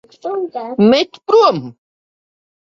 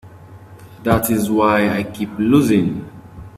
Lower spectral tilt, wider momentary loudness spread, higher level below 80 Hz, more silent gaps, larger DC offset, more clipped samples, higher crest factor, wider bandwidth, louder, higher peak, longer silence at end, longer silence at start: about the same, -6 dB/octave vs -6 dB/octave; about the same, 13 LU vs 14 LU; second, -60 dBFS vs -44 dBFS; neither; neither; neither; about the same, 16 dB vs 18 dB; second, 7.2 kHz vs 16 kHz; about the same, -15 LUFS vs -17 LUFS; about the same, -2 dBFS vs 0 dBFS; first, 0.9 s vs 0 s; first, 0.25 s vs 0.05 s